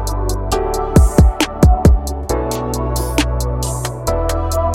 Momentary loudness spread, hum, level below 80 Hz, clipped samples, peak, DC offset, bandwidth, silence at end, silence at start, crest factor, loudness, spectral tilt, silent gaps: 9 LU; none; -18 dBFS; under 0.1%; 0 dBFS; under 0.1%; 16.5 kHz; 0 s; 0 s; 14 dB; -16 LUFS; -6 dB/octave; none